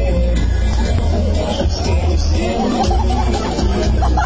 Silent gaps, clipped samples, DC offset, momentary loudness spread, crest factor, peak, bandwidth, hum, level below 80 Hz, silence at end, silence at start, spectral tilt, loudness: none; under 0.1%; 2%; 2 LU; 10 dB; -4 dBFS; 8 kHz; none; -16 dBFS; 0 s; 0 s; -6.5 dB/octave; -17 LUFS